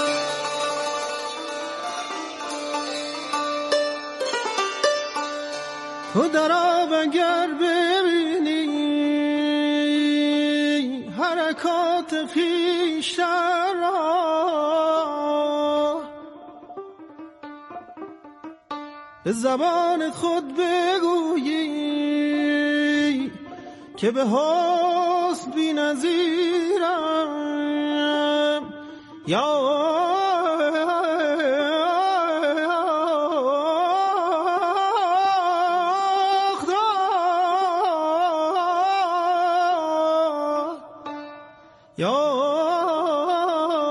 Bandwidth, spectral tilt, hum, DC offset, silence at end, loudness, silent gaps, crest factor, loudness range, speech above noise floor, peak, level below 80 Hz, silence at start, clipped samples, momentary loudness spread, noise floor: 11.5 kHz; -4 dB/octave; none; under 0.1%; 0 s; -22 LUFS; none; 16 dB; 5 LU; 29 dB; -6 dBFS; -72 dBFS; 0 s; under 0.1%; 14 LU; -50 dBFS